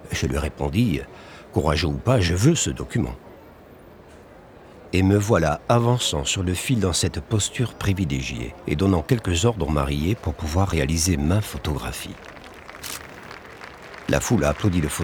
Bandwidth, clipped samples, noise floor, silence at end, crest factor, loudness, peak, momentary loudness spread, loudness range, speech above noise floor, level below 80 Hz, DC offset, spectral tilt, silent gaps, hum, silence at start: 19.5 kHz; under 0.1%; -46 dBFS; 0 s; 18 dB; -23 LUFS; -4 dBFS; 19 LU; 5 LU; 24 dB; -38 dBFS; under 0.1%; -5 dB/octave; none; none; 0 s